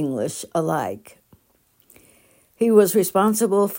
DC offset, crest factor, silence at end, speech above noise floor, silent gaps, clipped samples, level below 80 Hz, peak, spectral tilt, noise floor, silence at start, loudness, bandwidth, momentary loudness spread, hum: under 0.1%; 20 dB; 0 s; 42 dB; none; under 0.1%; -66 dBFS; -2 dBFS; -5.5 dB/octave; -62 dBFS; 0 s; -20 LUFS; 16.5 kHz; 11 LU; none